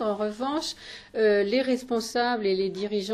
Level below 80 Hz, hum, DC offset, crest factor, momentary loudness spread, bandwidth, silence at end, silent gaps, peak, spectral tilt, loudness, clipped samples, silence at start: -60 dBFS; none; under 0.1%; 14 dB; 9 LU; 13.5 kHz; 0 s; none; -12 dBFS; -4.5 dB/octave; -26 LUFS; under 0.1%; 0 s